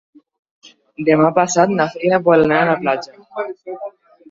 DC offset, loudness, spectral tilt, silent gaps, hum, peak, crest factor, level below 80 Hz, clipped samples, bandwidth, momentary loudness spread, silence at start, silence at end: under 0.1%; -16 LUFS; -5.5 dB/octave; none; none; -2 dBFS; 16 dB; -56 dBFS; under 0.1%; 7.8 kHz; 17 LU; 1 s; 0.4 s